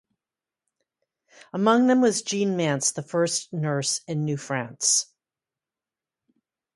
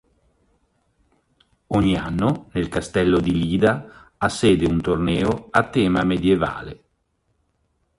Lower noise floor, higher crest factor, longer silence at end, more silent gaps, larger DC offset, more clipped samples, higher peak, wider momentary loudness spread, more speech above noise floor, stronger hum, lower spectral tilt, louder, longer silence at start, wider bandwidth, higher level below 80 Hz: first, under -90 dBFS vs -69 dBFS; about the same, 22 dB vs 20 dB; first, 1.7 s vs 1.25 s; neither; neither; neither; second, -6 dBFS vs -2 dBFS; about the same, 9 LU vs 7 LU; first, over 66 dB vs 49 dB; neither; second, -4 dB/octave vs -6.5 dB/octave; second, -23 LUFS vs -20 LUFS; second, 1.55 s vs 1.7 s; about the same, 11.5 kHz vs 11.5 kHz; second, -74 dBFS vs -40 dBFS